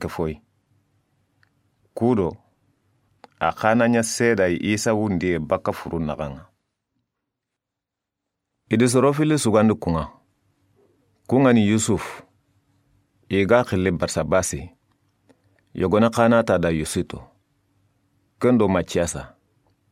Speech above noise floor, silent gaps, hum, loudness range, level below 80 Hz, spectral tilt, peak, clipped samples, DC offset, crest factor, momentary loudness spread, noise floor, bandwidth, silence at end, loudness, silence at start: 65 dB; none; none; 6 LU; -48 dBFS; -5.5 dB/octave; -2 dBFS; under 0.1%; under 0.1%; 22 dB; 14 LU; -85 dBFS; 16 kHz; 0.65 s; -21 LUFS; 0 s